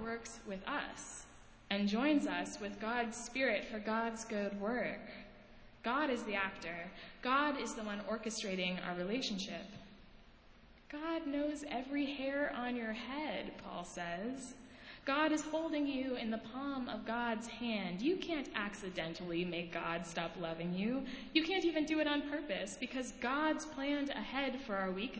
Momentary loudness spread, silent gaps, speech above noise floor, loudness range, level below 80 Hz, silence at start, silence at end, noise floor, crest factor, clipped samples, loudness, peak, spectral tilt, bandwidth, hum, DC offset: 10 LU; none; 23 dB; 4 LU; -64 dBFS; 0 s; 0 s; -61 dBFS; 22 dB; under 0.1%; -38 LUFS; -18 dBFS; -4.5 dB/octave; 8 kHz; none; under 0.1%